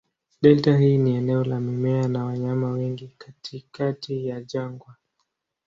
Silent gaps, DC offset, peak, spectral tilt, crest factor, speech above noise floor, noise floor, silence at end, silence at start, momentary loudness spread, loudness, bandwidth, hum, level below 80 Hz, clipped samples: none; under 0.1%; -2 dBFS; -8.5 dB/octave; 20 dB; 54 dB; -76 dBFS; 0.75 s; 0.4 s; 19 LU; -23 LUFS; 7.2 kHz; none; -60 dBFS; under 0.1%